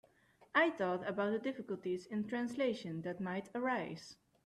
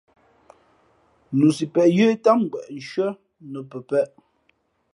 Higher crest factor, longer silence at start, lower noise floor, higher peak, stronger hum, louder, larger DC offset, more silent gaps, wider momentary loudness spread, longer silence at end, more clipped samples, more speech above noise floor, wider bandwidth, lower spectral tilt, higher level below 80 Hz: about the same, 20 dB vs 20 dB; second, 0.4 s vs 1.3 s; about the same, -68 dBFS vs -67 dBFS; second, -18 dBFS vs -2 dBFS; neither; second, -38 LUFS vs -21 LUFS; neither; neither; second, 10 LU vs 18 LU; second, 0.3 s vs 0.85 s; neither; second, 30 dB vs 46 dB; about the same, 12.5 kHz vs 11.5 kHz; about the same, -6 dB/octave vs -7 dB/octave; second, -78 dBFS vs -70 dBFS